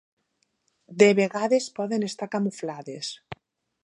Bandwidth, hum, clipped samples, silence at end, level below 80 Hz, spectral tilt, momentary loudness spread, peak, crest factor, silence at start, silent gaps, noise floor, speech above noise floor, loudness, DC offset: 11 kHz; none; under 0.1%; 0.5 s; -70 dBFS; -5 dB/octave; 23 LU; -2 dBFS; 24 dB; 0.9 s; none; -74 dBFS; 50 dB; -25 LUFS; under 0.1%